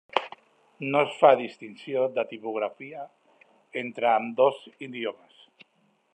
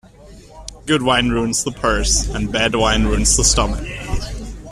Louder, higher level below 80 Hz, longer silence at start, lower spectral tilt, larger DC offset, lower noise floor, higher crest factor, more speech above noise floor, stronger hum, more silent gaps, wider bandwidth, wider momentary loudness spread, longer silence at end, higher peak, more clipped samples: second, -26 LUFS vs -17 LUFS; second, -86 dBFS vs -26 dBFS; about the same, 0.15 s vs 0.2 s; first, -6 dB/octave vs -3 dB/octave; neither; first, -68 dBFS vs -41 dBFS; first, 26 dB vs 18 dB; first, 42 dB vs 25 dB; neither; neither; second, 9 kHz vs 14 kHz; first, 20 LU vs 17 LU; first, 1 s vs 0 s; about the same, -2 dBFS vs 0 dBFS; neither